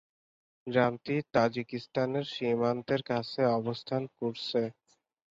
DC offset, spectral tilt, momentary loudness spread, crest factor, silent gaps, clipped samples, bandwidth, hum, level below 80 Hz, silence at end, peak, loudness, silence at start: under 0.1%; -7 dB/octave; 7 LU; 20 dB; none; under 0.1%; 7.6 kHz; none; -68 dBFS; 0.6 s; -12 dBFS; -31 LUFS; 0.65 s